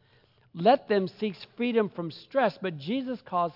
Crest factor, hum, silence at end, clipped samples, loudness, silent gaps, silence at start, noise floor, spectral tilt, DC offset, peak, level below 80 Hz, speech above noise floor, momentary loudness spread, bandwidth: 18 dB; none; 0.05 s; under 0.1%; -28 LUFS; none; 0.55 s; -63 dBFS; -8.5 dB/octave; under 0.1%; -10 dBFS; -76 dBFS; 35 dB; 11 LU; 5.8 kHz